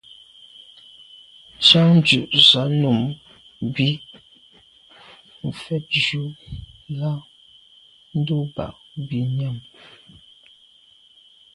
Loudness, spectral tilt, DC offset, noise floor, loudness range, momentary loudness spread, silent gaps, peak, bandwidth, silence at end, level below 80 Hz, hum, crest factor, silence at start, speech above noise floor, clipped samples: -18 LUFS; -5 dB/octave; under 0.1%; -53 dBFS; 12 LU; 21 LU; none; 0 dBFS; 11.5 kHz; 1.95 s; -54 dBFS; none; 22 dB; 1.6 s; 34 dB; under 0.1%